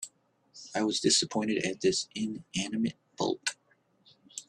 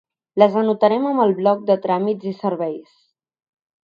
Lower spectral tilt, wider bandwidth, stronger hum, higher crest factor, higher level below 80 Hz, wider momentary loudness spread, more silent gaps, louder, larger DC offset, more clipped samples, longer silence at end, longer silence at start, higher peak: second, -3 dB/octave vs -9 dB/octave; first, 12.5 kHz vs 6.4 kHz; neither; about the same, 20 dB vs 20 dB; about the same, -70 dBFS vs -72 dBFS; about the same, 12 LU vs 10 LU; neither; second, -30 LUFS vs -19 LUFS; neither; neither; second, 0.05 s vs 1.15 s; second, 0 s vs 0.35 s; second, -12 dBFS vs 0 dBFS